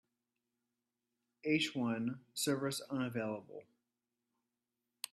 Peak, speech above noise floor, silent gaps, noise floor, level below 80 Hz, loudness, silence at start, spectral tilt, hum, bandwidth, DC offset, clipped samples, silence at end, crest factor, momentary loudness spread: -20 dBFS; 51 dB; none; -89 dBFS; -82 dBFS; -38 LUFS; 1.45 s; -4 dB/octave; none; 14.5 kHz; under 0.1%; under 0.1%; 1.5 s; 22 dB; 13 LU